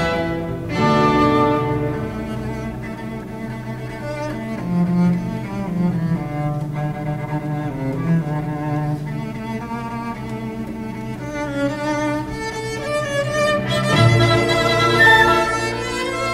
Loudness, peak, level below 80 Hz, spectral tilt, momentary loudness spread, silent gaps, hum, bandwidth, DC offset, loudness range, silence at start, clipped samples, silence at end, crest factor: -20 LUFS; 0 dBFS; -40 dBFS; -6 dB/octave; 13 LU; none; none; 15.5 kHz; under 0.1%; 10 LU; 0 s; under 0.1%; 0 s; 20 dB